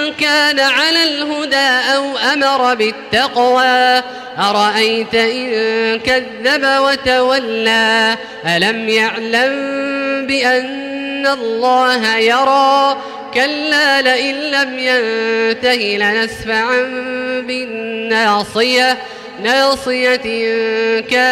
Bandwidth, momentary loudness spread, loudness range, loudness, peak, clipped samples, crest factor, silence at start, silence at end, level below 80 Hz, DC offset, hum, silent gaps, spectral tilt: 16 kHz; 8 LU; 3 LU; -13 LUFS; -2 dBFS; under 0.1%; 12 dB; 0 s; 0 s; -52 dBFS; under 0.1%; none; none; -2.5 dB/octave